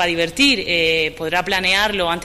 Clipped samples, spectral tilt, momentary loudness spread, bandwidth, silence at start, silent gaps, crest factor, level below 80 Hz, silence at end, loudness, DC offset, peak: under 0.1%; -3 dB/octave; 5 LU; 15.5 kHz; 0 s; none; 14 dB; -42 dBFS; 0 s; -16 LUFS; under 0.1%; -4 dBFS